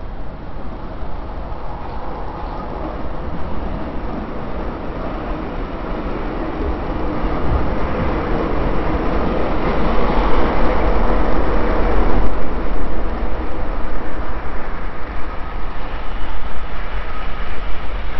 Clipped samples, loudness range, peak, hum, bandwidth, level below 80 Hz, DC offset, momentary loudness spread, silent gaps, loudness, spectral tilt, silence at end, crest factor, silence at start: under 0.1%; 9 LU; 0 dBFS; none; 5.8 kHz; -24 dBFS; under 0.1%; 11 LU; none; -23 LUFS; -6 dB/octave; 0 s; 14 dB; 0 s